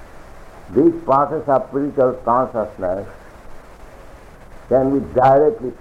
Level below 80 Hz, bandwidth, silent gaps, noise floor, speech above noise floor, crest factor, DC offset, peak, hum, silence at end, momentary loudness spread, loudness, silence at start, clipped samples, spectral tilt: -42 dBFS; 11 kHz; none; -40 dBFS; 23 dB; 14 dB; under 0.1%; -4 dBFS; none; 0.05 s; 10 LU; -17 LUFS; 0 s; under 0.1%; -9 dB/octave